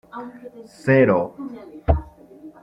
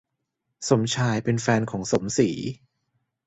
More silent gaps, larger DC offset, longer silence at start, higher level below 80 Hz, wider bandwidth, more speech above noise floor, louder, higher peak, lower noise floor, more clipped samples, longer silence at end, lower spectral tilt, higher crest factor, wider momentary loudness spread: neither; neither; second, 0.15 s vs 0.6 s; first, -34 dBFS vs -56 dBFS; first, 11 kHz vs 8.2 kHz; second, 23 dB vs 56 dB; first, -20 LUFS vs -24 LUFS; first, -2 dBFS vs -6 dBFS; second, -44 dBFS vs -79 dBFS; neither; second, 0.1 s vs 0.7 s; first, -9 dB/octave vs -5 dB/octave; about the same, 20 dB vs 20 dB; first, 22 LU vs 11 LU